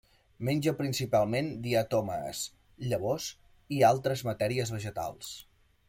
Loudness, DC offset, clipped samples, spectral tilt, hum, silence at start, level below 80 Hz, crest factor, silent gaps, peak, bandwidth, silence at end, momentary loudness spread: -31 LUFS; under 0.1%; under 0.1%; -5.5 dB/octave; none; 0.4 s; -60 dBFS; 20 dB; none; -10 dBFS; 16.5 kHz; 0.45 s; 14 LU